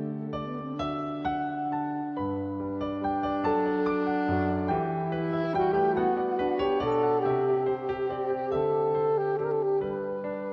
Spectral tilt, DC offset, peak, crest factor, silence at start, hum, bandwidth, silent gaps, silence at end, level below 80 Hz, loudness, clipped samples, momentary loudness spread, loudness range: -9 dB/octave; under 0.1%; -14 dBFS; 14 dB; 0 s; none; 6.2 kHz; none; 0 s; -58 dBFS; -28 LUFS; under 0.1%; 7 LU; 3 LU